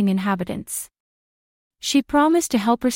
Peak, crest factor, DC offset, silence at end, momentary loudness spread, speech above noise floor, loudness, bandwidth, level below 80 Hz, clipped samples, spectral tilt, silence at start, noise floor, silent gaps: -6 dBFS; 16 dB; under 0.1%; 0 s; 12 LU; over 70 dB; -21 LUFS; 16.5 kHz; -54 dBFS; under 0.1%; -4.5 dB/octave; 0 s; under -90 dBFS; 1.00-1.71 s